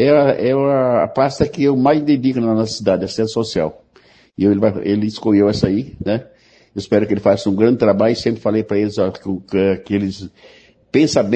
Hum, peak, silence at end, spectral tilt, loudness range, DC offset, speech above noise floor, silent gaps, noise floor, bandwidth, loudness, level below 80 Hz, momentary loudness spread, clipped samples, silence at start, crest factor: none; 0 dBFS; 0 s; -6.5 dB/octave; 2 LU; under 0.1%; 35 dB; none; -50 dBFS; 9 kHz; -17 LUFS; -48 dBFS; 8 LU; under 0.1%; 0 s; 16 dB